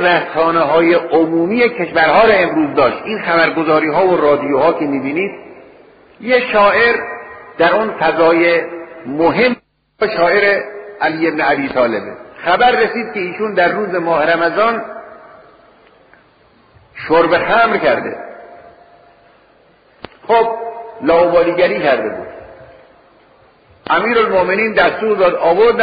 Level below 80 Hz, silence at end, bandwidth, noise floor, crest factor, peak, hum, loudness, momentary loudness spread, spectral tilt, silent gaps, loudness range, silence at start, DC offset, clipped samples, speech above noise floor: -48 dBFS; 0 s; 5 kHz; -50 dBFS; 14 dB; 0 dBFS; none; -13 LUFS; 14 LU; -2.5 dB/octave; none; 5 LU; 0 s; under 0.1%; under 0.1%; 37 dB